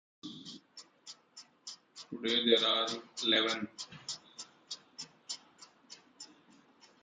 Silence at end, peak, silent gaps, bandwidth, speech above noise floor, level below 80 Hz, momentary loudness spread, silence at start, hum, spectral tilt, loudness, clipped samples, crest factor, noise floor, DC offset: 0.75 s; -14 dBFS; none; 9.6 kHz; 32 dB; -84 dBFS; 25 LU; 0.25 s; none; -2 dB/octave; -32 LUFS; under 0.1%; 24 dB; -64 dBFS; under 0.1%